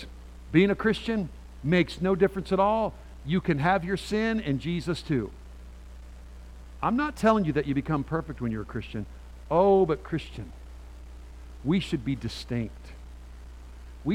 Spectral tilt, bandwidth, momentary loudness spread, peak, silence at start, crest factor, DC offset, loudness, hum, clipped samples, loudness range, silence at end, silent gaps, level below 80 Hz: -7 dB/octave; 14 kHz; 23 LU; -8 dBFS; 0 s; 20 dB; under 0.1%; -27 LUFS; none; under 0.1%; 7 LU; 0 s; none; -44 dBFS